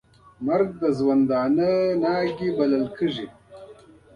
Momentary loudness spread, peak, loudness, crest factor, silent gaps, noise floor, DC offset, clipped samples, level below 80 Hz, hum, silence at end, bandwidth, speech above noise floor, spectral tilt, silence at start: 7 LU; -10 dBFS; -23 LUFS; 14 dB; none; -48 dBFS; under 0.1%; under 0.1%; -58 dBFS; none; 0.4 s; 7 kHz; 27 dB; -8 dB/octave; 0.4 s